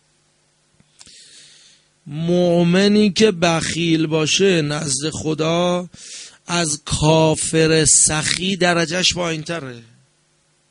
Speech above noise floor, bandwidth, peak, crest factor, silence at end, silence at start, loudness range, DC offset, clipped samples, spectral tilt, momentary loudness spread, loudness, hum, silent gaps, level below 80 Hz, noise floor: 44 dB; 11 kHz; 0 dBFS; 18 dB; 0.9 s; 2.05 s; 3 LU; under 0.1%; under 0.1%; -3.5 dB/octave; 13 LU; -16 LUFS; none; none; -46 dBFS; -61 dBFS